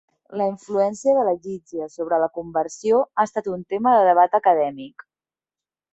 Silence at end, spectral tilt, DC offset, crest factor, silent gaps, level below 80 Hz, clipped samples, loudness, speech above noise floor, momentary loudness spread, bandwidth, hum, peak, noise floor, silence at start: 1.05 s; -5.5 dB/octave; under 0.1%; 16 dB; none; -66 dBFS; under 0.1%; -21 LUFS; over 70 dB; 15 LU; 8.2 kHz; none; -4 dBFS; under -90 dBFS; 0.3 s